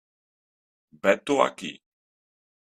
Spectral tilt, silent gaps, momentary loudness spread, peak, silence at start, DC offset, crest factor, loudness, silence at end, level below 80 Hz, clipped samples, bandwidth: -4 dB/octave; none; 15 LU; -2 dBFS; 1.05 s; under 0.1%; 26 dB; -24 LUFS; 0.95 s; -72 dBFS; under 0.1%; 13 kHz